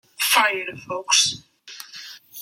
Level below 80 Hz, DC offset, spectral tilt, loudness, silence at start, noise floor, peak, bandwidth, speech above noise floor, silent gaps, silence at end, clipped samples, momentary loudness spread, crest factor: -68 dBFS; under 0.1%; 0.5 dB/octave; -19 LUFS; 0.2 s; -43 dBFS; -4 dBFS; 16.5 kHz; 20 dB; none; 0 s; under 0.1%; 20 LU; 20 dB